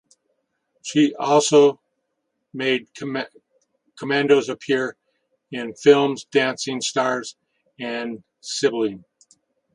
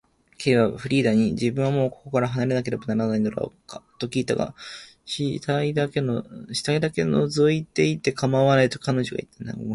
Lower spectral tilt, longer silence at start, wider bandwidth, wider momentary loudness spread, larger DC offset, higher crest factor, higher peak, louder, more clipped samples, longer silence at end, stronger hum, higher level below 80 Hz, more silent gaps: second, -4 dB/octave vs -6 dB/octave; first, 0.85 s vs 0.4 s; about the same, 11 kHz vs 11.5 kHz; first, 19 LU vs 13 LU; neither; about the same, 20 dB vs 18 dB; first, -2 dBFS vs -6 dBFS; first, -21 LUFS vs -24 LUFS; neither; first, 0.75 s vs 0 s; neither; second, -70 dBFS vs -56 dBFS; neither